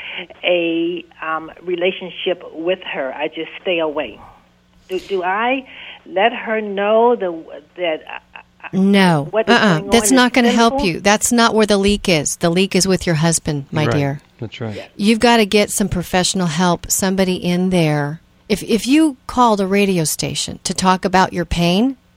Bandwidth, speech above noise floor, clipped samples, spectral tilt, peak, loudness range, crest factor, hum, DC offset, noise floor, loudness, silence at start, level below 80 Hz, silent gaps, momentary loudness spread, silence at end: 16.5 kHz; 36 dB; under 0.1%; -4.5 dB/octave; 0 dBFS; 8 LU; 16 dB; 60 Hz at -45 dBFS; under 0.1%; -52 dBFS; -16 LUFS; 0 s; -40 dBFS; none; 13 LU; 0.2 s